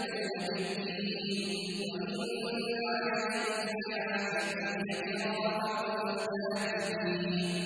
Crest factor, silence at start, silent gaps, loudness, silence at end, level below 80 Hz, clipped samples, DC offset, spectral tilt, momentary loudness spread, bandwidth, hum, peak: 14 dB; 0 s; none; -34 LUFS; 0 s; -74 dBFS; under 0.1%; under 0.1%; -4.5 dB/octave; 3 LU; 11 kHz; none; -20 dBFS